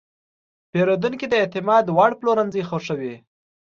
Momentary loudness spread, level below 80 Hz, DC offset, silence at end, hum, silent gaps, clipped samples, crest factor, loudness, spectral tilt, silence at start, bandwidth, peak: 10 LU; -64 dBFS; under 0.1%; 0.45 s; none; none; under 0.1%; 18 dB; -20 LUFS; -6.5 dB/octave; 0.75 s; 7.4 kHz; -4 dBFS